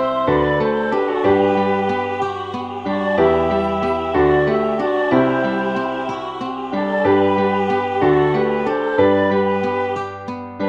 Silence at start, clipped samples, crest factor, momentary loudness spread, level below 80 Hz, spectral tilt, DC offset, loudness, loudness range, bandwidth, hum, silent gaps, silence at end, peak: 0 s; under 0.1%; 16 dB; 10 LU; -44 dBFS; -7.5 dB/octave; under 0.1%; -18 LUFS; 2 LU; 7.4 kHz; none; none; 0 s; -2 dBFS